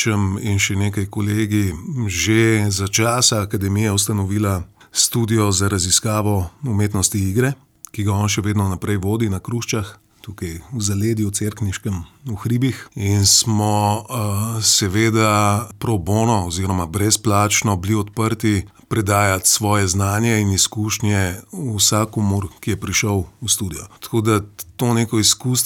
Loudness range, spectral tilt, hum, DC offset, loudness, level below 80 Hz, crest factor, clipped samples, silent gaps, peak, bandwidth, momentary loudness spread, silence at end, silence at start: 5 LU; -4 dB/octave; none; under 0.1%; -18 LUFS; -44 dBFS; 16 dB; under 0.1%; none; -2 dBFS; 18 kHz; 10 LU; 0 s; 0 s